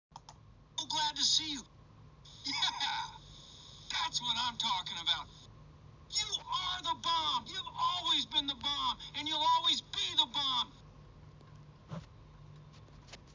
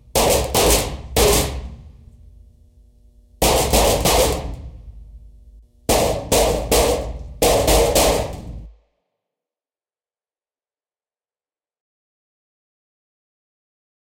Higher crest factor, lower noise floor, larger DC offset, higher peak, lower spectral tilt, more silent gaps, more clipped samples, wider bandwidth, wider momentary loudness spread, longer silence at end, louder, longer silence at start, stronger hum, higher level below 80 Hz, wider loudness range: about the same, 22 dB vs 20 dB; second, -57 dBFS vs under -90 dBFS; neither; second, -16 dBFS vs 0 dBFS; second, -1 dB/octave vs -3 dB/octave; neither; neither; second, 7.6 kHz vs 16.5 kHz; about the same, 19 LU vs 18 LU; second, 0 s vs 5.3 s; second, -33 LUFS vs -17 LUFS; about the same, 0.15 s vs 0.15 s; neither; second, -62 dBFS vs -30 dBFS; about the same, 5 LU vs 3 LU